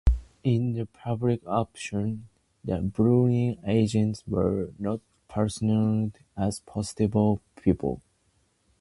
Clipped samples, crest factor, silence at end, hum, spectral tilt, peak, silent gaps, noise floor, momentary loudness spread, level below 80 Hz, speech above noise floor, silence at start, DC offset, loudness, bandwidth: under 0.1%; 18 dB; 0.8 s; none; -7.5 dB/octave; -8 dBFS; none; -69 dBFS; 10 LU; -38 dBFS; 43 dB; 0.05 s; under 0.1%; -27 LUFS; 11.5 kHz